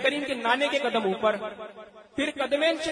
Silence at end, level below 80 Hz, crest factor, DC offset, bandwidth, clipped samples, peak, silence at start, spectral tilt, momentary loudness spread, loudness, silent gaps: 0 s; -66 dBFS; 18 dB; under 0.1%; 10.5 kHz; under 0.1%; -10 dBFS; 0 s; -3.5 dB/octave; 14 LU; -26 LUFS; none